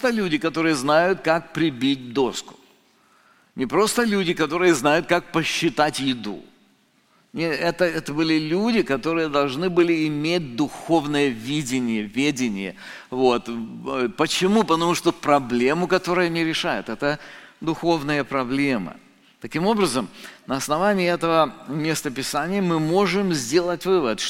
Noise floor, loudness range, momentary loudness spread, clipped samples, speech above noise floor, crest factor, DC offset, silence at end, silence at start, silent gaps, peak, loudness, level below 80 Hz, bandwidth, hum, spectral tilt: -61 dBFS; 3 LU; 10 LU; under 0.1%; 39 dB; 20 dB; under 0.1%; 0 s; 0 s; none; -2 dBFS; -22 LUFS; -54 dBFS; 16.5 kHz; none; -4.5 dB/octave